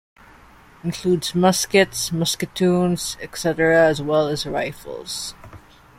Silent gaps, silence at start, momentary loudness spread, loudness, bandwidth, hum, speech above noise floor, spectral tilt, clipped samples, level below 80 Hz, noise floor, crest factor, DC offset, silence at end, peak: none; 0.85 s; 13 LU; -20 LUFS; 16.5 kHz; none; 28 dB; -4.5 dB/octave; under 0.1%; -50 dBFS; -48 dBFS; 20 dB; under 0.1%; 0.4 s; -2 dBFS